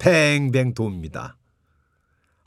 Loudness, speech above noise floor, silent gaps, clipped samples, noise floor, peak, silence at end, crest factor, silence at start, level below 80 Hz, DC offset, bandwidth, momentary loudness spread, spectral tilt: -20 LUFS; 47 dB; none; under 0.1%; -67 dBFS; -4 dBFS; 1.15 s; 18 dB; 0 s; -52 dBFS; under 0.1%; 15 kHz; 19 LU; -5.5 dB/octave